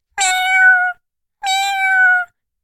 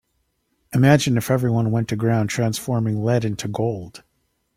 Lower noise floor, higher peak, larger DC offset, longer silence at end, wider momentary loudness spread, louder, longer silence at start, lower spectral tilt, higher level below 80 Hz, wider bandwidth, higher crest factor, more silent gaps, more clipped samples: second, -56 dBFS vs -70 dBFS; about the same, -2 dBFS vs -2 dBFS; neither; second, 0.4 s vs 0.6 s; about the same, 11 LU vs 10 LU; first, -13 LUFS vs -20 LUFS; second, 0.15 s vs 0.7 s; second, 4 dB/octave vs -6.5 dB/octave; second, -58 dBFS vs -52 dBFS; about the same, 15.5 kHz vs 16 kHz; about the same, 14 dB vs 18 dB; neither; neither